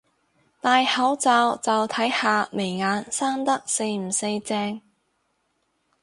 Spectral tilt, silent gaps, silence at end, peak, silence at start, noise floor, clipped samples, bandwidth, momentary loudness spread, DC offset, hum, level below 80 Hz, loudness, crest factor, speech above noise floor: -2.5 dB/octave; none; 1.25 s; -6 dBFS; 0.65 s; -72 dBFS; under 0.1%; 11.5 kHz; 8 LU; under 0.1%; none; -70 dBFS; -23 LUFS; 18 dB; 49 dB